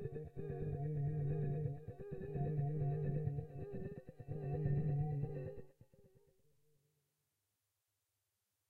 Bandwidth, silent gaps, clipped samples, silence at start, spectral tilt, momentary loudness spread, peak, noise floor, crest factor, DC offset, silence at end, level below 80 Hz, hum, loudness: 2.8 kHz; none; under 0.1%; 0 s; -11.5 dB/octave; 11 LU; -26 dBFS; -88 dBFS; 16 dB; under 0.1%; 2.6 s; -60 dBFS; none; -42 LUFS